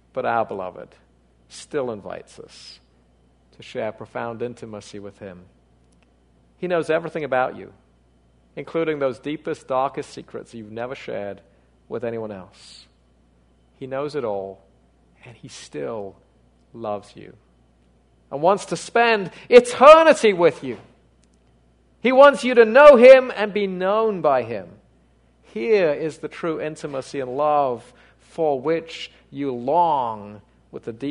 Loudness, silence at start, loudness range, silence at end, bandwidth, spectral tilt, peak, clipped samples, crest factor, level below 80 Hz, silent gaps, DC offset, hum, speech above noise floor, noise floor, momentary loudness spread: -18 LUFS; 0.15 s; 20 LU; 0 s; 11 kHz; -5 dB/octave; 0 dBFS; under 0.1%; 20 dB; -58 dBFS; none; under 0.1%; none; 39 dB; -58 dBFS; 24 LU